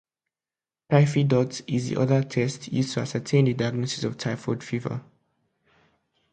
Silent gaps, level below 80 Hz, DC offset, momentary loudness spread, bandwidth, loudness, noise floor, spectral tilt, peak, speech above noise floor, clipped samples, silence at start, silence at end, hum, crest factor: none; -62 dBFS; under 0.1%; 9 LU; 9.2 kHz; -25 LUFS; under -90 dBFS; -6.5 dB/octave; -4 dBFS; over 66 dB; under 0.1%; 0.9 s; 1.3 s; none; 22 dB